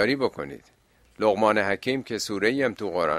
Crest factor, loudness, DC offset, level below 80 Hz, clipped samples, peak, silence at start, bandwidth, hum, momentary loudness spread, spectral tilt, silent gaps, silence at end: 20 dB; -25 LUFS; under 0.1%; -60 dBFS; under 0.1%; -6 dBFS; 0 s; 15 kHz; none; 12 LU; -4.5 dB/octave; none; 0 s